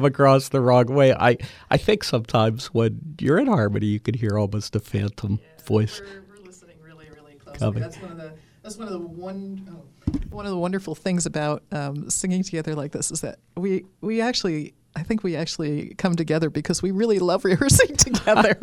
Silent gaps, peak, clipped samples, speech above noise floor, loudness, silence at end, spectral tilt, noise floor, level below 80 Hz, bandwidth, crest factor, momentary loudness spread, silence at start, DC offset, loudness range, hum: none; -2 dBFS; under 0.1%; 26 dB; -22 LUFS; 0 s; -5 dB/octave; -48 dBFS; -44 dBFS; 16 kHz; 22 dB; 17 LU; 0 s; under 0.1%; 12 LU; none